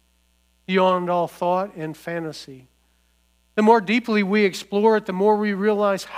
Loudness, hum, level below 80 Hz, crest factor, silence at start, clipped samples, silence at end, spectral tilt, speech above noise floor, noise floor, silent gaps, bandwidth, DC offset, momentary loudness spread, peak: -21 LUFS; 60 Hz at -60 dBFS; -64 dBFS; 18 dB; 0.7 s; under 0.1%; 0 s; -6 dB/octave; 43 dB; -63 dBFS; none; 15.5 kHz; under 0.1%; 12 LU; -4 dBFS